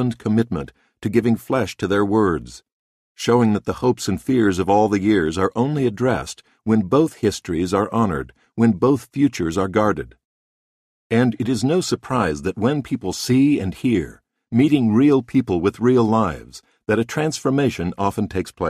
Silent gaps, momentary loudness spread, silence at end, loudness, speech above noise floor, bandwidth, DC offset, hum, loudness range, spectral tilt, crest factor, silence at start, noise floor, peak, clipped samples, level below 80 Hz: 2.72-3.15 s, 10.24-11.10 s; 9 LU; 0 s; -20 LUFS; over 71 dB; 14.5 kHz; under 0.1%; none; 3 LU; -6.5 dB/octave; 16 dB; 0 s; under -90 dBFS; -4 dBFS; under 0.1%; -46 dBFS